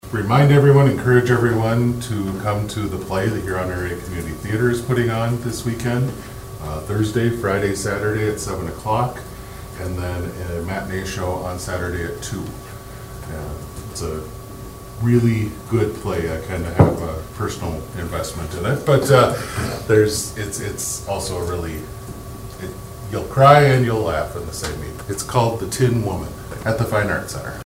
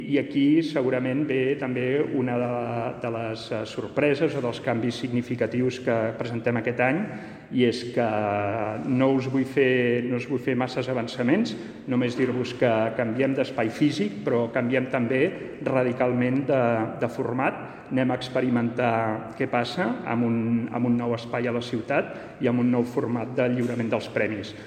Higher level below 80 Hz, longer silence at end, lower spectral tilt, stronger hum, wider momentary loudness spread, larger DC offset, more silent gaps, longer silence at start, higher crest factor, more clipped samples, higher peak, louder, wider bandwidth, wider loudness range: first, -38 dBFS vs -62 dBFS; about the same, 0.05 s vs 0 s; about the same, -6 dB/octave vs -7 dB/octave; neither; first, 18 LU vs 6 LU; first, 0.1% vs under 0.1%; neither; about the same, 0.05 s vs 0 s; about the same, 20 dB vs 18 dB; neither; first, 0 dBFS vs -6 dBFS; first, -20 LUFS vs -25 LUFS; first, 16.5 kHz vs 9.6 kHz; first, 9 LU vs 2 LU